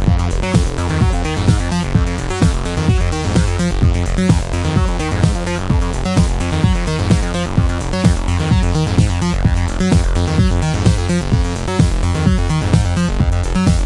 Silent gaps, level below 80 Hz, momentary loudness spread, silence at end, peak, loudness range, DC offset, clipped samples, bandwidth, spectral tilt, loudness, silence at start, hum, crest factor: none; -20 dBFS; 2 LU; 0 s; 0 dBFS; 1 LU; under 0.1%; under 0.1%; 11.5 kHz; -6 dB/octave; -16 LUFS; 0 s; none; 14 dB